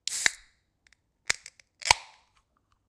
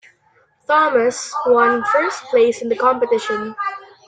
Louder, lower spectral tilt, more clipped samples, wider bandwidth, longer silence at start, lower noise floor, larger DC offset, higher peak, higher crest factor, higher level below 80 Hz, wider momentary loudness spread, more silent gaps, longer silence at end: second, -28 LUFS vs -17 LUFS; second, 1 dB/octave vs -3 dB/octave; neither; first, 15.5 kHz vs 9.4 kHz; second, 0.05 s vs 0.7 s; first, -71 dBFS vs -58 dBFS; neither; about the same, -2 dBFS vs -2 dBFS; first, 32 dB vs 16 dB; first, -56 dBFS vs -64 dBFS; first, 16 LU vs 10 LU; neither; first, 0.85 s vs 0.25 s